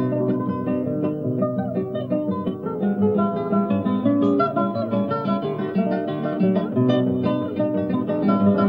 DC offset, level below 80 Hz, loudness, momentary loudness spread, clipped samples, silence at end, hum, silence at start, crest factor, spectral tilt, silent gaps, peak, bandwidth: under 0.1%; -66 dBFS; -22 LUFS; 5 LU; under 0.1%; 0 s; none; 0 s; 14 dB; -10.5 dB/octave; none; -6 dBFS; 5.2 kHz